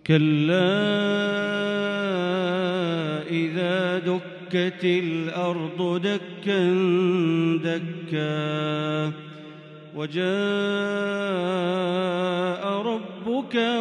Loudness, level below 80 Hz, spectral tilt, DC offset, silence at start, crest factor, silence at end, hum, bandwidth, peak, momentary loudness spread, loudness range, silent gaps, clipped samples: -24 LUFS; -70 dBFS; -7 dB/octave; under 0.1%; 0.05 s; 18 dB; 0 s; none; 9.8 kHz; -8 dBFS; 8 LU; 3 LU; none; under 0.1%